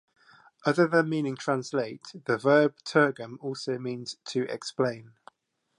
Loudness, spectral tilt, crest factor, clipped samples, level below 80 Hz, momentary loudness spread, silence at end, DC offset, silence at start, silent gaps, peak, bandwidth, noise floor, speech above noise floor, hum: -28 LUFS; -5.5 dB/octave; 20 dB; under 0.1%; -78 dBFS; 13 LU; 0.75 s; under 0.1%; 0.65 s; none; -8 dBFS; 11.5 kHz; -67 dBFS; 39 dB; none